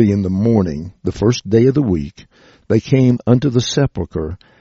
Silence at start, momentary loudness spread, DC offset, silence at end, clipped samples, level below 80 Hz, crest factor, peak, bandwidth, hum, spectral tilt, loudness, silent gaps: 0 s; 11 LU; under 0.1%; 0.25 s; under 0.1%; -38 dBFS; 16 dB; 0 dBFS; 7.6 kHz; none; -7.5 dB/octave; -16 LUFS; none